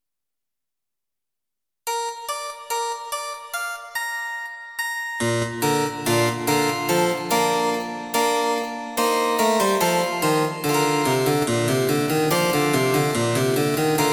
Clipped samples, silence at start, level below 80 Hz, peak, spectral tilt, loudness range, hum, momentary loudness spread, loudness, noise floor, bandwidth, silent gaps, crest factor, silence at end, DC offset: under 0.1%; 1.85 s; -60 dBFS; -6 dBFS; -4 dB/octave; 8 LU; none; 9 LU; -22 LUFS; -87 dBFS; 19.5 kHz; none; 16 dB; 0 s; under 0.1%